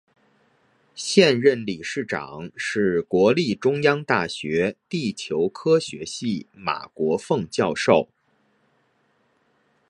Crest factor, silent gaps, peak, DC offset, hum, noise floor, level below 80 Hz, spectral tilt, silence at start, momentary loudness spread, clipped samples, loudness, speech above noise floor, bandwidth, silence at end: 22 dB; none; -2 dBFS; under 0.1%; none; -66 dBFS; -60 dBFS; -5 dB/octave; 0.95 s; 11 LU; under 0.1%; -22 LUFS; 44 dB; 11.5 kHz; 1.85 s